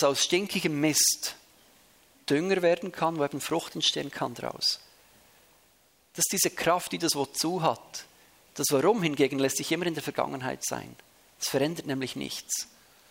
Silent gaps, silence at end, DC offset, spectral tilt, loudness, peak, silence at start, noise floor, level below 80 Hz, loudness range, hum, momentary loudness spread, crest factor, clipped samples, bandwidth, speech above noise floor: none; 0.45 s; under 0.1%; -3 dB/octave; -28 LUFS; -8 dBFS; 0 s; -64 dBFS; -68 dBFS; 3 LU; none; 12 LU; 20 dB; under 0.1%; 16 kHz; 36 dB